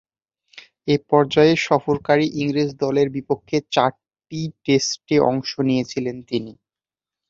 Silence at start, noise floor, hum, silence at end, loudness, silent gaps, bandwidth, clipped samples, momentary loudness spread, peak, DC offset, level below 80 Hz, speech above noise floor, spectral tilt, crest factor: 0.55 s; under -90 dBFS; none; 0.75 s; -20 LUFS; none; 7.8 kHz; under 0.1%; 12 LU; -2 dBFS; under 0.1%; -58 dBFS; over 70 dB; -5.5 dB/octave; 20 dB